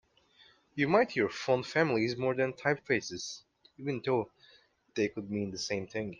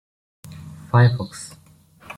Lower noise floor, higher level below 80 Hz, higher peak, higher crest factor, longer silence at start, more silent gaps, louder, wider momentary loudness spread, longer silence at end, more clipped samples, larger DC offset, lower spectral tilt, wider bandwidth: first, -64 dBFS vs -49 dBFS; second, -70 dBFS vs -54 dBFS; second, -12 dBFS vs -2 dBFS; about the same, 20 dB vs 20 dB; first, 0.75 s vs 0.45 s; neither; second, -32 LUFS vs -19 LUFS; second, 14 LU vs 23 LU; about the same, 0.05 s vs 0.05 s; neither; neither; second, -5 dB/octave vs -6.5 dB/octave; second, 9.6 kHz vs 11.5 kHz